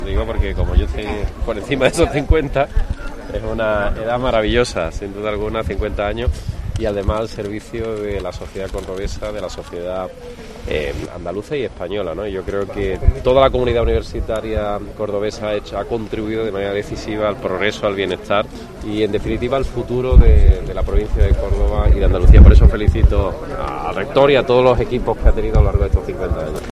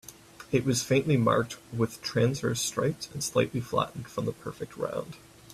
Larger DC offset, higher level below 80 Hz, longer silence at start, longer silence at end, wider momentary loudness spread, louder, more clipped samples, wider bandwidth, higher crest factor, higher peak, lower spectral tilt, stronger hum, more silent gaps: neither; first, -18 dBFS vs -60 dBFS; about the same, 0 s vs 0.05 s; about the same, 0.05 s vs 0 s; about the same, 12 LU vs 14 LU; first, -18 LUFS vs -29 LUFS; first, 0.3% vs under 0.1%; second, 11.5 kHz vs 15 kHz; about the same, 16 dB vs 18 dB; first, 0 dBFS vs -10 dBFS; first, -7 dB/octave vs -5 dB/octave; neither; neither